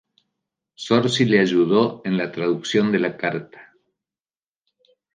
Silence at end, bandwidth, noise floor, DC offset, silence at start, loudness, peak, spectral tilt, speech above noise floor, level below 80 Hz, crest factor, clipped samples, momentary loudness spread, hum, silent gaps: 1.5 s; 9.6 kHz; under -90 dBFS; under 0.1%; 0.8 s; -20 LUFS; -4 dBFS; -5.5 dB/octave; over 70 dB; -66 dBFS; 20 dB; under 0.1%; 9 LU; none; none